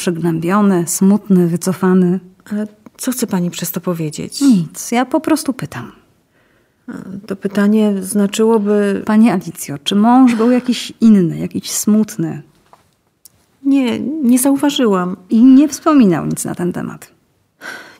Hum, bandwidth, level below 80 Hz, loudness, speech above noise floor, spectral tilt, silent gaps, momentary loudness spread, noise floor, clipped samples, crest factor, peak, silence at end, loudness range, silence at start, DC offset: none; 16 kHz; -58 dBFS; -14 LUFS; 44 dB; -5.5 dB/octave; none; 14 LU; -57 dBFS; under 0.1%; 14 dB; -2 dBFS; 0.15 s; 6 LU; 0 s; under 0.1%